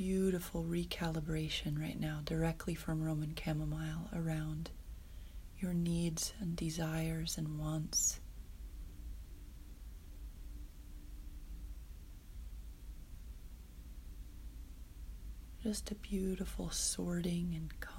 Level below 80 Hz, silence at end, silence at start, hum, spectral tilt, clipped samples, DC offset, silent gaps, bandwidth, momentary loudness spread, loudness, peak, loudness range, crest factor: -48 dBFS; 0 s; 0 s; none; -4.5 dB/octave; under 0.1%; under 0.1%; none; 16 kHz; 18 LU; -39 LUFS; -22 dBFS; 16 LU; 18 dB